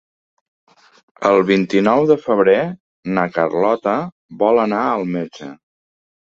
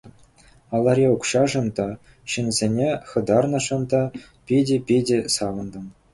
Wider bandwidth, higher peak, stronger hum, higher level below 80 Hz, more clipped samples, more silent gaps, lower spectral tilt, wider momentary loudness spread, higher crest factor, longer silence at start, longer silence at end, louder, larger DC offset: second, 7.6 kHz vs 11.5 kHz; first, 0 dBFS vs -6 dBFS; neither; second, -60 dBFS vs -52 dBFS; neither; first, 2.80-3.03 s, 4.12-4.29 s vs none; first, -7 dB/octave vs -5 dB/octave; first, 14 LU vs 11 LU; about the same, 18 dB vs 16 dB; first, 1.2 s vs 0.05 s; first, 0.85 s vs 0.2 s; first, -17 LUFS vs -22 LUFS; neither